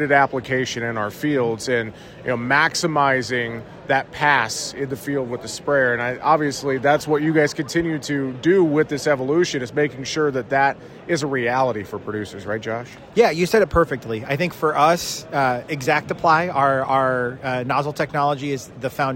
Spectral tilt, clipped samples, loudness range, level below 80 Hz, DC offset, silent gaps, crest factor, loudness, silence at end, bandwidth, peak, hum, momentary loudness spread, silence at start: -5 dB/octave; under 0.1%; 2 LU; -50 dBFS; under 0.1%; none; 18 dB; -20 LUFS; 0 s; 16.5 kHz; -2 dBFS; none; 10 LU; 0 s